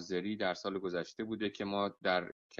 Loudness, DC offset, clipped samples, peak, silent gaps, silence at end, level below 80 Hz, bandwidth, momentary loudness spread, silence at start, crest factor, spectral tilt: -37 LUFS; under 0.1%; under 0.1%; -18 dBFS; 2.32-2.50 s; 0.05 s; -70 dBFS; 7.6 kHz; 5 LU; 0 s; 18 dB; -5 dB/octave